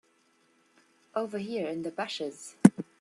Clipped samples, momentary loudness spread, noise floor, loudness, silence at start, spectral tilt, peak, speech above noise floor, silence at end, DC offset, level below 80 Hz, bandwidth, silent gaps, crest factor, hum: under 0.1%; 13 LU; -68 dBFS; -29 LUFS; 1.15 s; -6 dB/octave; -2 dBFS; 34 dB; 0.2 s; under 0.1%; -74 dBFS; 12.5 kHz; none; 28 dB; none